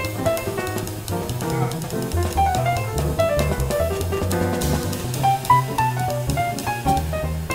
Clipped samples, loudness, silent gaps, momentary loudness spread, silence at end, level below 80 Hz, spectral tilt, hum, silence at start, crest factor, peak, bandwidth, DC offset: under 0.1%; -22 LUFS; none; 7 LU; 0 s; -32 dBFS; -5.5 dB/octave; none; 0 s; 16 dB; -4 dBFS; 16.5 kHz; under 0.1%